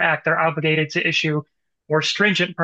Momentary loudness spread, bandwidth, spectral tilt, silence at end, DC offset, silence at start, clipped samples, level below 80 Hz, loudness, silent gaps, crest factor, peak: 6 LU; 8.4 kHz; -4.5 dB/octave; 0 s; under 0.1%; 0 s; under 0.1%; -70 dBFS; -19 LUFS; none; 16 dB; -4 dBFS